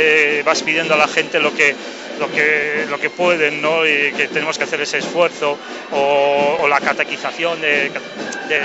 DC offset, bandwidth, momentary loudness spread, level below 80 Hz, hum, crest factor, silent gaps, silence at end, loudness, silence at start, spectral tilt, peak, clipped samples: under 0.1%; 8.2 kHz; 8 LU; -66 dBFS; none; 14 dB; none; 0 s; -16 LUFS; 0 s; -2.5 dB/octave; -2 dBFS; under 0.1%